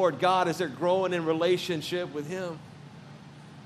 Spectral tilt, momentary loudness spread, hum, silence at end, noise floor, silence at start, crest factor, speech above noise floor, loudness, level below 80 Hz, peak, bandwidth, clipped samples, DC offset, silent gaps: -5.5 dB/octave; 23 LU; none; 0 s; -47 dBFS; 0 s; 18 dB; 20 dB; -28 LUFS; -76 dBFS; -10 dBFS; 14 kHz; under 0.1%; under 0.1%; none